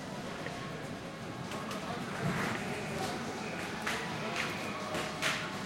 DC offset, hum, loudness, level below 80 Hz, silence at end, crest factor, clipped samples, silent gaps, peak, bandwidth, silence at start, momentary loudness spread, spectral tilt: under 0.1%; none; -37 LUFS; -62 dBFS; 0 s; 20 dB; under 0.1%; none; -18 dBFS; 16 kHz; 0 s; 8 LU; -4 dB/octave